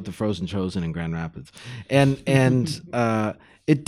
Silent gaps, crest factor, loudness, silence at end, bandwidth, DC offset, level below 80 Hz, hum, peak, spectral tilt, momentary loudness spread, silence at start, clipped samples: none; 18 dB; -23 LUFS; 0.05 s; 13 kHz; under 0.1%; -52 dBFS; none; -6 dBFS; -7 dB/octave; 14 LU; 0 s; under 0.1%